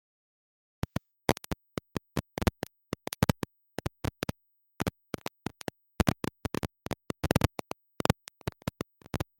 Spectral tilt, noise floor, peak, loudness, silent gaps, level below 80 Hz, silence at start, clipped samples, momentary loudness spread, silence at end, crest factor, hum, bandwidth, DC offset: -5.5 dB/octave; -64 dBFS; -8 dBFS; -35 LUFS; none; -48 dBFS; 1.3 s; under 0.1%; 11 LU; 0.15 s; 26 dB; none; 16.5 kHz; under 0.1%